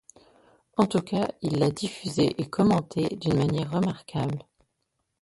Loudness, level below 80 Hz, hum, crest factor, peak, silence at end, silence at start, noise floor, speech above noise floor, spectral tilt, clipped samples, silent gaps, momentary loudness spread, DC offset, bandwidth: -27 LUFS; -58 dBFS; none; 18 dB; -8 dBFS; 0.8 s; 0.8 s; -78 dBFS; 52 dB; -6.5 dB/octave; under 0.1%; none; 8 LU; under 0.1%; 11.5 kHz